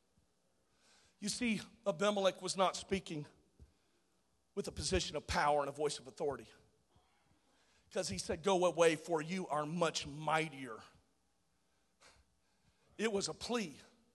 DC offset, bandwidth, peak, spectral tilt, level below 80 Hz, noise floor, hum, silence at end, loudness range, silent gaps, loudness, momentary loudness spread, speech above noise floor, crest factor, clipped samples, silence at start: under 0.1%; 12.5 kHz; -16 dBFS; -4 dB/octave; -60 dBFS; -80 dBFS; none; 0.3 s; 7 LU; none; -37 LUFS; 12 LU; 43 dB; 22 dB; under 0.1%; 1.2 s